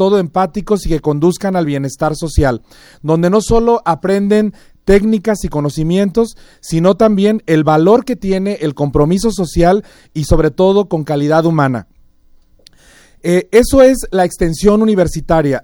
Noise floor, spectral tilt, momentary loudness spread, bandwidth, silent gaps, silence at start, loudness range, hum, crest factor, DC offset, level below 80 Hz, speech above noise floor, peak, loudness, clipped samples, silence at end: -47 dBFS; -6.5 dB/octave; 8 LU; 18 kHz; none; 0 s; 3 LU; none; 12 dB; under 0.1%; -28 dBFS; 34 dB; 0 dBFS; -13 LUFS; under 0.1%; 0.05 s